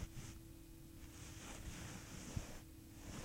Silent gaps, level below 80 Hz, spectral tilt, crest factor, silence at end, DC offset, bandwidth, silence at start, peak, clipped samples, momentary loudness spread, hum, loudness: none; -56 dBFS; -4 dB/octave; 22 dB; 0 s; under 0.1%; 16 kHz; 0 s; -30 dBFS; under 0.1%; 9 LU; none; -53 LUFS